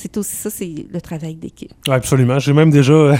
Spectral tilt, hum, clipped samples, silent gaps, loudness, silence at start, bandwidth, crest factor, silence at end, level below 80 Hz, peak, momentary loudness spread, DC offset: -6.5 dB/octave; none; under 0.1%; none; -15 LUFS; 0 s; 17 kHz; 14 dB; 0 s; -46 dBFS; 0 dBFS; 18 LU; under 0.1%